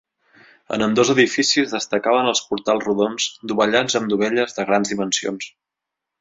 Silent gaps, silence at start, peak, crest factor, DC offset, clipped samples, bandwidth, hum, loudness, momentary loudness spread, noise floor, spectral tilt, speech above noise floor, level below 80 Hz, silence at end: none; 0.7 s; -2 dBFS; 18 dB; under 0.1%; under 0.1%; 8 kHz; none; -19 LUFS; 7 LU; -84 dBFS; -3 dB/octave; 65 dB; -60 dBFS; 0.75 s